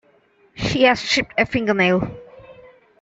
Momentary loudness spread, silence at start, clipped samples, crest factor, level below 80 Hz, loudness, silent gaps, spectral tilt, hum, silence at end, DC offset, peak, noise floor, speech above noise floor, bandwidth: 12 LU; 0.55 s; under 0.1%; 18 dB; -46 dBFS; -18 LUFS; none; -4.5 dB/octave; none; 0.5 s; under 0.1%; -2 dBFS; -57 dBFS; 39 dB; 8 kHz